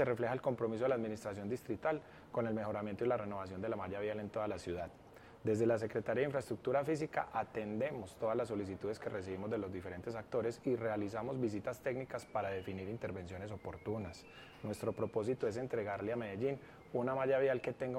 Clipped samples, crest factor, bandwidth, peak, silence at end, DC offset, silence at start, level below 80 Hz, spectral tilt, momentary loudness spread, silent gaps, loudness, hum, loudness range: under 0.1%; 18 dB; 16 kHz; -22 dBFS; 0 s; under 0.1%; 0 s; -70 dBFS; -7 dB/octave; 9 LU; none; -39 LUFS; none; 4 LU